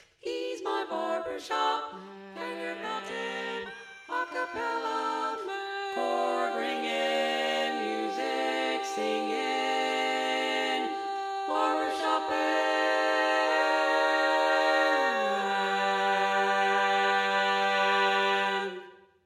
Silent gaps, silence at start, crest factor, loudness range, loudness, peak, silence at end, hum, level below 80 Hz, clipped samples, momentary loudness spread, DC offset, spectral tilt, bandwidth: none; 0.25 s; 16 dB; 8 LU; -28 LUFS; -14 dBFS; 0.3 s; none; -78 dBFS; under 0.1%; 10 LU; under 0.1%; -2.5 dB/octave; 15 kHz